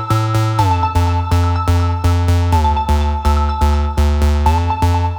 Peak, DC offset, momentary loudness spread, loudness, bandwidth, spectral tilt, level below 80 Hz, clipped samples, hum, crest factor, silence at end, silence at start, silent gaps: -2 dBFS; under 0.1%; 2 LU; -15 LUFS; 19 kHz; -6.5 dB/octave; -20 dBFS; under 0.1%; none; 12 dB; 0 s; 0 s; none